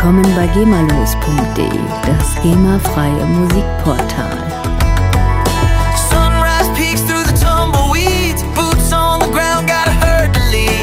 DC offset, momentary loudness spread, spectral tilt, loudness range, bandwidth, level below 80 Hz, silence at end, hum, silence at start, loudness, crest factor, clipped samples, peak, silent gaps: under 0.1%; 5 LU; -5 dB/octave; 2 LU; 16.5 kHz; -18 dBFS; 0 s; none; 0 s; -13 LUFS; 12 dB; under 0.1%; 0 dBFS; none